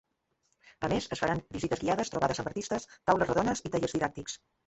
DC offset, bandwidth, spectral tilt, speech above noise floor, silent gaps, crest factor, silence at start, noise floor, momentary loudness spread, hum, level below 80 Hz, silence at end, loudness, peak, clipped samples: under 0.1%; 8.4 kHz; -5 dB/octave; 46 dB; none; 22 dB; 0.8 s; -77 dBFS; 7 LU; none; -56 dBFS; 0.3 s; -31 LUFS; -10 dBFS; under 0.1%